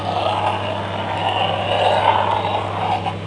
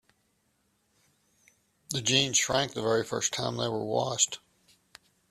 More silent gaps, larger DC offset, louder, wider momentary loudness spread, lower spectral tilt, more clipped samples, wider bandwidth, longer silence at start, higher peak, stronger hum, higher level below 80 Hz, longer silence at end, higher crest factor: neither; neither; first, -19 LUFS vs -27 LUFS; about the same, 7 LU vs 7 LU; first, -5.5 dB/octave vs -2.5 dB/octave; neither; second, 10.5 kHz vs 14.5 kHz; second, 0 s vs 1.9 s; first, -2 dBFS vs -10 dBFS; neither; first, -50 dBFS vs -64 dBFS; second, 0 s vs 0.95 s; about the same, 18 dB vs 22 dB